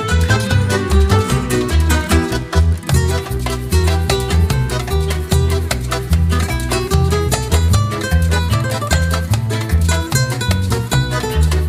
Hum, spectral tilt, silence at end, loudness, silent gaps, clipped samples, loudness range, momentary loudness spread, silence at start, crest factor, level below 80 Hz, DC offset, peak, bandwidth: none; -5 dB/octave; 0 s; -16 LUFS; none; under 0.1%; 1 LU; 4 LU; 0 s; 14 dB; -22 dBFS; under 0.1%; 0 dBFS; 16 kHz